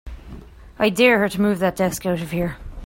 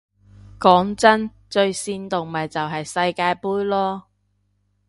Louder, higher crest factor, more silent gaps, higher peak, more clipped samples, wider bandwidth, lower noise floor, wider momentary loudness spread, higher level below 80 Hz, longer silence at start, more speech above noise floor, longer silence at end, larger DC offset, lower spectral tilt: about the same, -20 LUFS vs -20 LUFS; about the same, 18 dB vs 22 dB; neither; about the same, -2 dBFS vs 0 dBFS; neither; first, 16.5 kHz vs 11.5 kHz; second, -40 dBFS vs -67 dBFS; about the same, 12 LU vs 10 LU; first, -40 dBFS vs -56 dBFS; second, 0.05 s vs 0.6 s; second, 21 dB vs 47 dB; second, 0 s vs 0.9 s; neither; about the same, -5 dB/octave vs -4.5 dB/octave